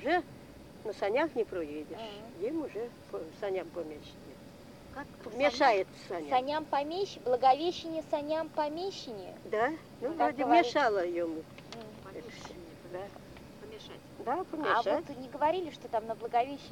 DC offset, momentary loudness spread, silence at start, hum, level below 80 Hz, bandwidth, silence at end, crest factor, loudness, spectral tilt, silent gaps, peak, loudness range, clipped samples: under 0.1%; 20 LU; 0 s; none; -66 dBFS; 18.5 kHz; 0 s; 22 dB; -32 LUFS; -4.5 dB/octave; none; -12 dBFS; 10 LU; under 0.1%